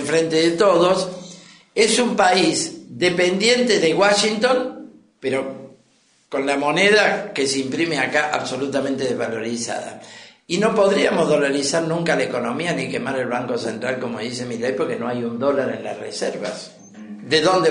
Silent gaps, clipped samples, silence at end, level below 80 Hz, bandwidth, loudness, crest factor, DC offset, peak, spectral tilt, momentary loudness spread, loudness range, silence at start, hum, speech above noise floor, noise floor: none; under 0.1%; 0 s; -62 dBFS; 10.5 kHz; -19 LUFS; 16 dB; under 0.1%; -4 dBFS; -3.5 dB/octave; 13 LU; 6 LU; 0 s; none; 40 dB; -59 dBFS